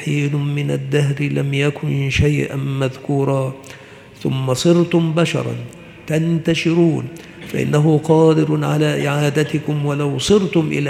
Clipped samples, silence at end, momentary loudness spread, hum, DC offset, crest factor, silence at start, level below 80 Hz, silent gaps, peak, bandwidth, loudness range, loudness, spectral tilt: under 0.1%; 0 s; 12 LU; none; under 0.1%; 16 dB; 0 s; -44 dBFS; none; 0 dBFS; 13.5 kHz; 3 LU; -17 LUFS; -6.5 dB/octave